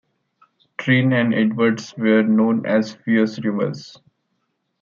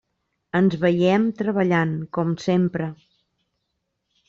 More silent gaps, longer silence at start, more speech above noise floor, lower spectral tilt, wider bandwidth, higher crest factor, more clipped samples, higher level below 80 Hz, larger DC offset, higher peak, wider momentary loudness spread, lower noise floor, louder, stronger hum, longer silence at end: neither; first, 0.8 s vs 0.55 s; about the same, 54 dB vs 56 dB; about the same, -7 dB/octave vs -8 dB/octave; about the same, 7.2 kHz vs 7.4 kHz; about the same, 16 dB vs 16 dB; neither; about the same, -66 dBFS vs -62 dBFS; neither; first, -4 dBFS vs -8 dBFS; first, 10 LU vs 7 LU; second, -72 dBFS vs -77 dBFS; first, -19 LUFS vs -22 LUFS; neither; second, 0.9 s vs 1.35 s